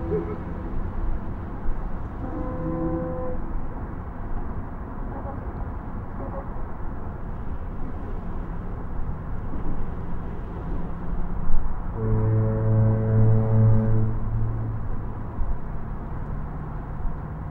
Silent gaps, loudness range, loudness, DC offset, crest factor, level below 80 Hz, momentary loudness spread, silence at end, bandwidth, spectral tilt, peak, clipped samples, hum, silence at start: none; 12 LU; -29 LUFS; under 0.1%; 20 dB; -30 dBFS; 14 LU; 0 s; 2.6 kHz; -12 dB/octave; -4 dBFS; under 0.1%; none; 0 s